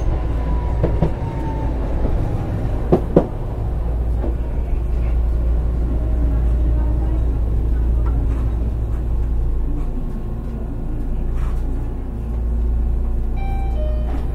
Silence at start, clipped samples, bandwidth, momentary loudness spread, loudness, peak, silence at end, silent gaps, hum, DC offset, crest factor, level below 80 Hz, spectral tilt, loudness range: 0 s; under 0.1%; 4 kHz; 7 LU; -22 LUFS; 0 dBFS; 0 s; none; none; under 0.1%; 18 dB; -20 dBFS; -9.5 dB/octave; 4 LU